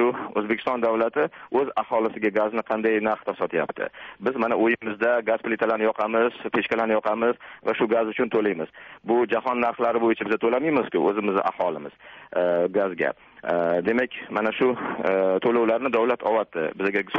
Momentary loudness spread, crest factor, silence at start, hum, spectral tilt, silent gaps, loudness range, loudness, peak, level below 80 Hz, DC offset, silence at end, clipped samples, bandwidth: 6 LU; 14 dB; 0 s; none; -3.5 dB/octave; none; 2 LU; -24 LUFS; -10 dBFS; -66 dBFS; under 0.1%; 0 s; under 0.1%; 6 kHz